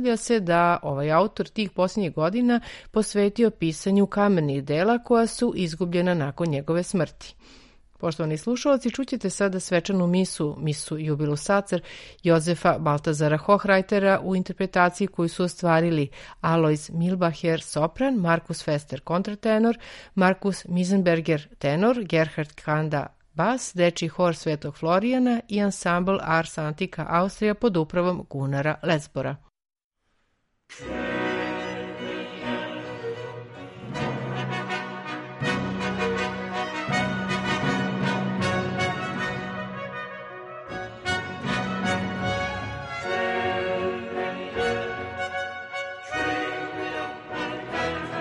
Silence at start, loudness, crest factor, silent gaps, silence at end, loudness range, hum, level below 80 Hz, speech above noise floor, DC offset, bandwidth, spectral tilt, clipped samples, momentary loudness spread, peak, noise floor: 0 s; -25 LUFS; 20 dB; 29.84-29.91 s; 0 s; 7 LU; none; -54 dBFS; 48 dB; under 0.1%; 11.5 kHz; -6 dB/octave; under 0.1%; 11 LU; -6 dBFS; -71 dBFS